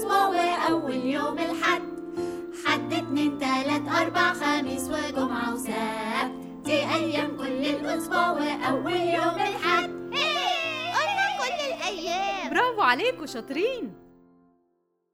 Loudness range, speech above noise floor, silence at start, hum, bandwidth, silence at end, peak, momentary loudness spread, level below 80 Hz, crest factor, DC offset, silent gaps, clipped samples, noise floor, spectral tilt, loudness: 2 LU; 45 dB; 0 s; none; over 20 kHz; 1.15 s; -8 dBFS; 7 LU; -60 dBFS; 20 dB; under 0.1%; none; under 0.1%; -72 dBFS; -3.5 dB/octave; -26 LUFS